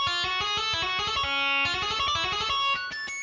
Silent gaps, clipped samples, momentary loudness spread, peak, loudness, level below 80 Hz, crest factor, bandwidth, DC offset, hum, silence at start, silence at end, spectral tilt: none; under 0.1%; 2 LU; -16 dBFS; -25 LUFS; -50 dBFS; 12 dB; 7.6 kHz; under 0.1%; none; 0 s; 0 s; -1 dB/octave